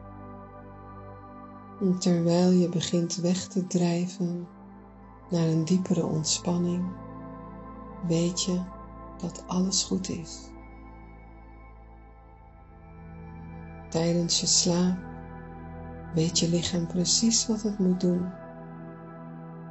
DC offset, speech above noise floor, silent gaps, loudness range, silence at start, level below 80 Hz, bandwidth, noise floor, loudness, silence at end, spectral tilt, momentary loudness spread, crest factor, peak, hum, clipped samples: under 0.1%; 24 dB; none; 8 LU; 0 s; -52 dBFS; 8.2 kHz; -50 dBFS; -26 LUFS; 0 s; -4.5 dB/octave; 22 LU; 20 dB; -10 dBFS; none; under 0.1%